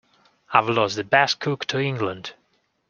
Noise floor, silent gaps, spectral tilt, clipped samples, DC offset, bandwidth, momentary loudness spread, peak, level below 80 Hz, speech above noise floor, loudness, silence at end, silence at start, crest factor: -49 dBFS; none; -4.5 dB/octave; under 0.1%; under 0.1%; 7.4 kHz; 10 LU; 0 dBFS; -64 dBFS; 27 dB; -22 LUFS; 0.55 s; 0.5 s; 22 dB